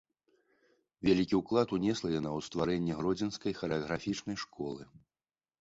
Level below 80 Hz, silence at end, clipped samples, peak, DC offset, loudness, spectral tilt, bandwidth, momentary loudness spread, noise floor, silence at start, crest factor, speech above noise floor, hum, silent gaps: -60 dBFS; 0.75 s; under 0.1%; -14 dBFS; under 0.1%; -33 LUFS; -6 dB/octave; 8 kHz; 10 LU; under -90 dBFS; 1 s; 20 dB; over 57 dB; none; none